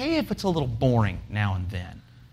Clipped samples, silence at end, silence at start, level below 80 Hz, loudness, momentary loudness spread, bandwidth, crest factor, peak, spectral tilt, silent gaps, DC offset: under 0.1%; 0.05 s; 0 s; -44 dBFS; -26 LUFS; 11 LU; 15 kHz; 16 dB; -10 dBFS; -7 dB/octave; none; under 0.1%